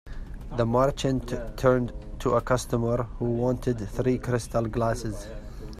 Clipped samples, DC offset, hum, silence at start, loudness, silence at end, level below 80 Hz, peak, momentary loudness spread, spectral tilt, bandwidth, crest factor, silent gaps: under 0.1%; under 0.1%; none; 0.05 s; -27 LUFS; 0 s; -38 dBFS; -8 dBFS; 12 LU; -6.5 dB/octave; 14.5 kHz; 18 dB; none